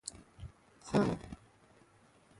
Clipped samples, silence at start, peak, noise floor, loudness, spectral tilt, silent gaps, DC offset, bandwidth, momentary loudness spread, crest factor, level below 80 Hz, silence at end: under 0.1%; 0.05 s; -18 dBFS; -65 dBFS; -35 LUFS; -6 dB/octave; none; under 0.1%; 11.5 kHz; 22 LU; 22 dB; -58 dBFS; 1.05 s